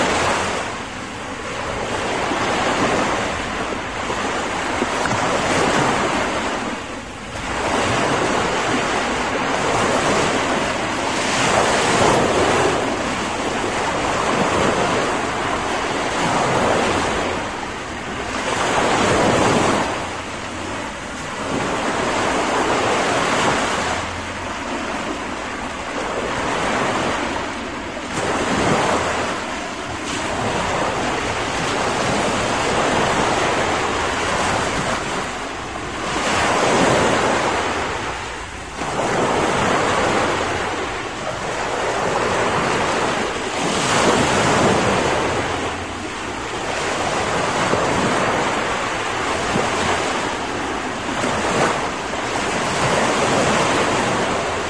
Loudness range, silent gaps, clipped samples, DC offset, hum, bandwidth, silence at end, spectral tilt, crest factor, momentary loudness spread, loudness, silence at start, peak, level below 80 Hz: 4 LU; none; under 0.1%; 0.4%; none; 10.5 kHz; 0 s; -3.5 dB/octave; 18 dB; 10 LU; -20 LUFS; 0 s; -2 dBFS; -42 dBFS